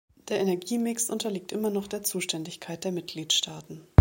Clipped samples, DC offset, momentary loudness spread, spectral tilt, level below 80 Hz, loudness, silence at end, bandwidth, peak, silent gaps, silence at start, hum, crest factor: under 0.1%; under 0.1%; 9 LU; -4 dB/octave; -66 dBFS; -29 LUFS; 0.2 s; 17 kHz; -2 dBFS; none; 0.25 s; none; 26 dB